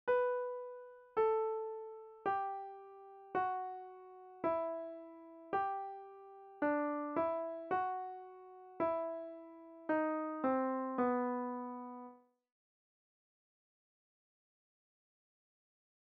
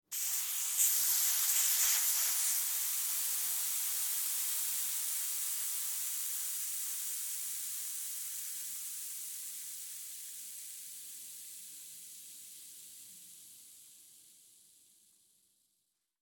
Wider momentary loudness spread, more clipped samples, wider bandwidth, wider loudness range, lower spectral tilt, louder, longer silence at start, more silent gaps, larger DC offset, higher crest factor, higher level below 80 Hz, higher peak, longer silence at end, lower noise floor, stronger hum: about the same, 19 LU vs 20 LU; neither; second, 5.2 kHz vs over 20 kHz; second, 4 LU vs 21 LU; first, -4.5 dB/octave vs 4.5 dB/octave; second, -39 LUFS vs -32 LUFS; about the same, 0.05 s vs 0.1 s; neither; neither; about the same, 18 dB vs 22 dB; first, -82 dBFS vs under -90 dBFS; second, -22 dBFS vs -16 dBFS; first, 3.85 s vs 1.9 s; second, -58 dBFS vs -82 dBFS; neither